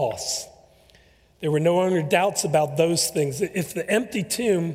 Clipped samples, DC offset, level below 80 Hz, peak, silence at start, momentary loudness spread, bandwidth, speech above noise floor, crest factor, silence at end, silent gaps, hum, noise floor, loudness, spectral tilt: under 0.1%; under 0.1%; -60 dBFS; -6 dBFS; 0 s; 7 LU; 16 kHz; 34 dB; 18 dB; 0 s; none; none; -56 dBFS; -23 LUFS; -4.5 dB/octave